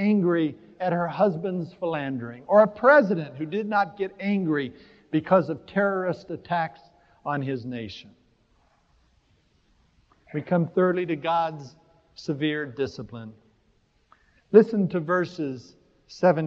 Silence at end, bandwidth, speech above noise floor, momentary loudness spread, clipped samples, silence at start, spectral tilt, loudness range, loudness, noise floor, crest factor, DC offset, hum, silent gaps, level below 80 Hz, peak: 0 s; 7.2 kHz; 41 dB; 16 LU; under 0.1%; 0 s; -8 dB/octave; 11 LU; -25 LUFS; -65 dBFS; 24 dB; under 0.1%; none; none; -66 dBFS; -2 dBFS